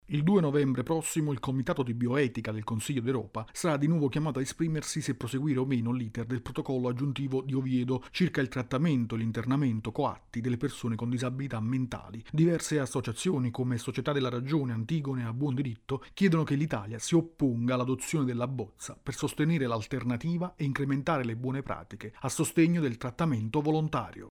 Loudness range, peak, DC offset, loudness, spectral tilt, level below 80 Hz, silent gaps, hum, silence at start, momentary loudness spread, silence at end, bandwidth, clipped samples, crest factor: 2 LU; -14 dBFS; under 0.1%; -31 LUFS; -6 dB/octave; -58 dBFS; none; none; 0.1 s; 7 LU; 0 s; 15.5 kHz; under 0.1%; 16 dB